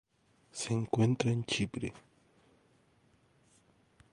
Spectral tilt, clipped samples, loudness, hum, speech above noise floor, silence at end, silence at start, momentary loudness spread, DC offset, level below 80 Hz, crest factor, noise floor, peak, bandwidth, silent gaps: -5.5 dB/octave; under 0.1%; -33 LUFS; none; 37 dB; 2.15 s; 0.55 s; 12 LU; under 0.1%; -64 dBFS; 22 dB; -69 dBFS; -14 dBFS; 11.5 kHz; none